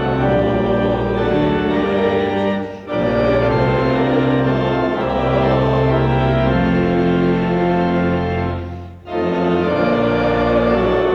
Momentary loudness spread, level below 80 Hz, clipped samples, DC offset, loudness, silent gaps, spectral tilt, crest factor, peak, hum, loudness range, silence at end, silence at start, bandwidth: 5 LU; -32 dBFS; under 0.1%; under 0.1%; -17 LUFS; none; -8.5 dB/octave; 12 dB; -4 dBFS; none; 2 LU; 0 s; 0 s; 7.2 kHz